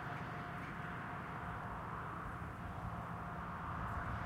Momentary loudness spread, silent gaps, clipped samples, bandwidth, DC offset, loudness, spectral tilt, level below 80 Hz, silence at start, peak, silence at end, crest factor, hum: 3 LU; none; under 0.1%; 16 kHz; under 0.1%; -45 LUFS; -7 dB/octave; -56 dBFS; 0 s; -30 dBFS; 0 s; 14 dB; none